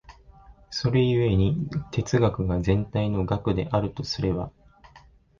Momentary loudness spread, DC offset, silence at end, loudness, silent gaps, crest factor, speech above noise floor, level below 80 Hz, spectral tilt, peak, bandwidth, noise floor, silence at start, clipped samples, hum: 8 LU; under 0.1%; 0.4 s; -25 LUFS; none; 16 dB; 30 dB; -40 dBFS; -7 dB/octave; -8 dBFS; 7.4 kHz; -54 dBFS; 0.1 s; under 0.1%; none